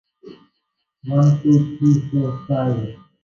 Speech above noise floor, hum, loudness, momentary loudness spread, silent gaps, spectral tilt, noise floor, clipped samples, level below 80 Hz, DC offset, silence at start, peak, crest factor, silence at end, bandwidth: 57 dB; none; -18 LUFS; 10 LU; none; -9.5 dB/octave; -74 dBFS; under 0.1%; -54 dBFS; under 0.1%; 0.25 s; -4 dBFS; 14 dB; 0.3 s; 7 kHz